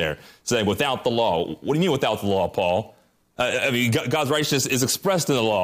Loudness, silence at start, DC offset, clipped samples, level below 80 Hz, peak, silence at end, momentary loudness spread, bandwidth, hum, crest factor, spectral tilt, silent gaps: -22 LUFS; 0 s; under 0.1%; under 0.1%; -56 dBFS; -10 dBFS; 0 s; 5 LU; 15.5 kHz; none; 14 dB; -4 dB/octave; none